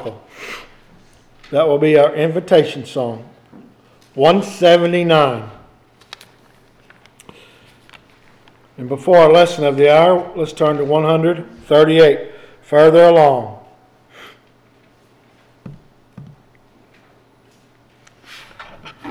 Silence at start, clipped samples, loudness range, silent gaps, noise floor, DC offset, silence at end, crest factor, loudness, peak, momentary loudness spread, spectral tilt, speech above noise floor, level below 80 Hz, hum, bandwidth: 0 s; under 0.1%; 6 LU; none; -52 dBFS; under 0.1%; 0 s; 16 dB; -13 LUFS; 0 dBFS; 23 LU; -6.5 dB/octave; 39 dB; -56 dBFS; none; 12.5 kHz